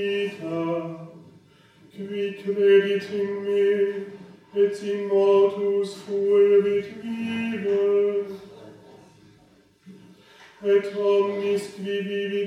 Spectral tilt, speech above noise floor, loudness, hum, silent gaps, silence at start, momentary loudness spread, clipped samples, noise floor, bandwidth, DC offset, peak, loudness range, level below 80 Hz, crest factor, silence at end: -6.5 dB/octave; 35 dB; -23 LUFS; none; none; 0 s; 14 LU; under 0.1%; -57 dBFS; 10.5 kHz; under 0.1%; -8 dBFS; 6 LU; -72 dBFS; 16 dB; 0 s